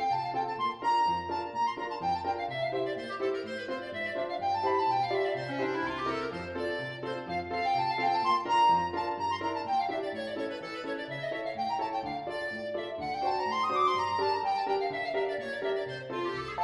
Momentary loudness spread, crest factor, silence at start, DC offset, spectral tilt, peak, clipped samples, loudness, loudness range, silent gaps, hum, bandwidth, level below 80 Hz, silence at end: 8 LU; 16 dB; 0 s; under 0.1%; -5 dB/octave; -16 dBFS; under 0.1%; -31 LUFS; 4 LU; none; none; 11.5 kHz; -64 dBFS; 0 s